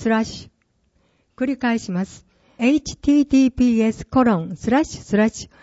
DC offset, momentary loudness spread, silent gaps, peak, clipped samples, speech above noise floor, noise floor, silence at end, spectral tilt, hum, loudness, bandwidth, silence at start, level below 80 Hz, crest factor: under 0.1%; 10 LU; none; -6 dBFS; under 0.1%; 46 dB; -64 dBFS; 0.2 s; -6 dB/octave; none; -20 LUFS; 8 kHz; 0 s; -46 dBFS; 14 dB